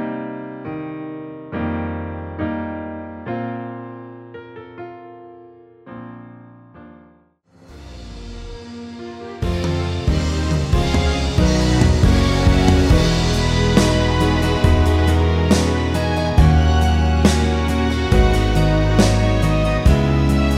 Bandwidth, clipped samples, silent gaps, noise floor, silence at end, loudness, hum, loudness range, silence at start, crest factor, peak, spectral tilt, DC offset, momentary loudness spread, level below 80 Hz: 14 kHz; under 0.1%; none; -53 dBFS; 0 s; -17 LUFS; none; 21 LU; 0 s; 18 dB; 0 dBFS; -6 dB/octave; under 0.1%; 20 LU; -22 dBFS